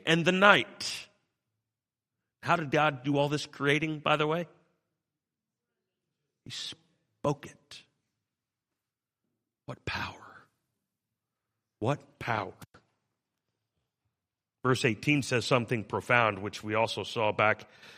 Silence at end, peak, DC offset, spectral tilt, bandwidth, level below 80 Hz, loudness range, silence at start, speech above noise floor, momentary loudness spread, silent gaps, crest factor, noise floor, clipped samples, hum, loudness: 0.05 s; -4 dBFS; under 0.1%; -5 dB/octave; 15 kHz; -68 dBFS; 14 LU; 0.05 s; over 61 dB; 14 LU; none; 28 dB; under -90 dBFS; under 0.1%; none; -29 LUFS